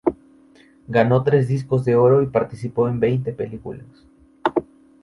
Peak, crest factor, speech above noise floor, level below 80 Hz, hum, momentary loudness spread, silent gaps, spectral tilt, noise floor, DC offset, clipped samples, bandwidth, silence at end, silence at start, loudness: -2 dBFS; 18 dB; 32 dB; -52 dBFS; none; 14 LU; none; -9 dB/octave; -51 dBFS; under 0.1%; under 0.1%; 11 kHz; 0.4 s; 0.05 s; -20 LUFS